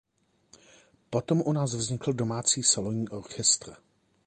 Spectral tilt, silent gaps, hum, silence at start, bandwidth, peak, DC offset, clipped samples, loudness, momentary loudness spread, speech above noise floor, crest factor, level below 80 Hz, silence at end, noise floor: -3.5 dB/octave; none; none; 1.1 s; 11 kHz; -10 dBFS; under 0.1%; under 0.1%; -27 LUFS; 10 LU; 35 dB; 20 dB; -62 dBFS; 0.5 s; -63 dBFS